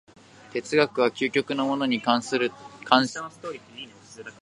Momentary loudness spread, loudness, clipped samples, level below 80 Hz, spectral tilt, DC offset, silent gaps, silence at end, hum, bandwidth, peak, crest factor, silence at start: 20 LU; -24 LUFS; under 0.1%; -72 dBFS; -4 dB/octave; under 0.1%; none; 0.1 s; none; 11.5 kHz; -2 dBFS; 24 dB; 0.5 s